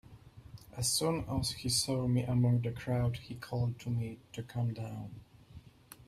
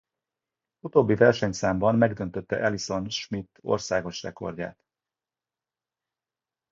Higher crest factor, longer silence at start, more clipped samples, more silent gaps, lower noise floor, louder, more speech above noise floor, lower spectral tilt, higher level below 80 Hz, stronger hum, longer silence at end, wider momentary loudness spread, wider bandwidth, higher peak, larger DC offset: second, 16 dB vs 22 dB; second, 0.05 s vs 0.85 s; neither; neither; second, -55 dBFS vs under -90 dBFS; second, -34 LUFS vs -26 LUFS; second, 22 dB vs over 65 dB; about the same, -5 dB/octave vs -5.5 dB/octave; about the same, -56 dBFS vs -56 dBFS; neither; second, 0.15 s vs 2 s; about the same, 16 LU vs 15 LU; first, 15 kHz vs 7.8 kHz; second, -18 dBFS vs -4 dBFS; neither